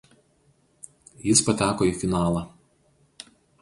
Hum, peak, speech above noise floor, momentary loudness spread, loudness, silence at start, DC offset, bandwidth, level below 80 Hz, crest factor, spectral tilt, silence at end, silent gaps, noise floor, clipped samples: none; -4 dBFS; 41 dB; 26 LU; -23 LUFS; 1.2 s; under 0.1%; 11.5 kHz; -48 dBFS; 24 dB; -4 dB/octave; 1.15 s; none; -64 dBFS; under 0.1%